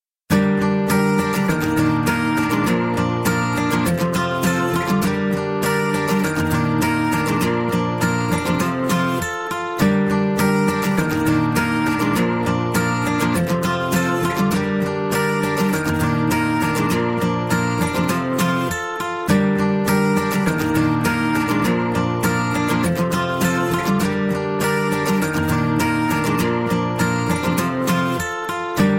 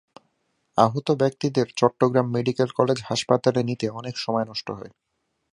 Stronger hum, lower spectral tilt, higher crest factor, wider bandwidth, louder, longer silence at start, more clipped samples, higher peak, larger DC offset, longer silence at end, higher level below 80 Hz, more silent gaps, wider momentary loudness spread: neither; about the same, -5.5 dB/octave vs -6 dB/octave; second, 14 dB vs 22 dB; first, 16.5 kHz vs 11.5 kHz; first, -19 LUFS vs -23 LUFS; second, 0.3 s vs 0.75 s; neither; about the same, -4 dBFS vs -2 dBFS; neither; second, 0 s vs 0.65 s; first, -44 dBFS vs -62 dBFS; neither; second, 3 LU vs 9 LU